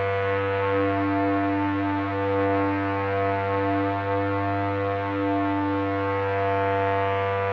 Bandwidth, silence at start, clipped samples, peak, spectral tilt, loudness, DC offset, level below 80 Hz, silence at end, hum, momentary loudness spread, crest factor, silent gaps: 6 kHz; 0 s; under 0.1%; -12 dBFS; -9 dB/octave; -24 LUFS; under 0.1%; -62 dBFS; 0 s; none; 2 LU; 12 dB; none